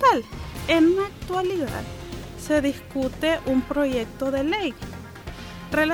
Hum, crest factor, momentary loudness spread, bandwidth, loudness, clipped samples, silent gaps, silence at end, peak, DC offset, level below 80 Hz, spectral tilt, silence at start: none; 16 dB; 17 LU; 20 kHz; -24 LUFS; under 0.1%; none; 0 s; -8 dBFS; under 0.1%; -42 dBFS; -5.5 dB/octave; 0 s